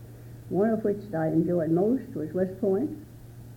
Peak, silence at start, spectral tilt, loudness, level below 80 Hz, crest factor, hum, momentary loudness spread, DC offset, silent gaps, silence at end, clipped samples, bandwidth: -14 dBFS; 0 s; -10 dB/octave; -27 LUFS; -56 dBFS; 14 dB; none; 20 LU; under 0.1%; none; 0 s; under 0.1%; 17 kHz